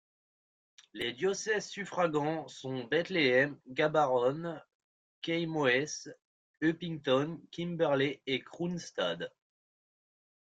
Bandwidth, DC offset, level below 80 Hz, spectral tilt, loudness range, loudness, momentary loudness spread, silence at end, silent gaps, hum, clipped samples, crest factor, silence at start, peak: 10 kHz; under 0.1%; -74 dBFS; -4.5 dB/octave; 3 LU; -32 LUFS; 12 LU; 1.2 s; 4.74-5.22 s, 6.25-6.54 s; none; under 0.1%; 20 dB; 0.95 s; -14 dBFS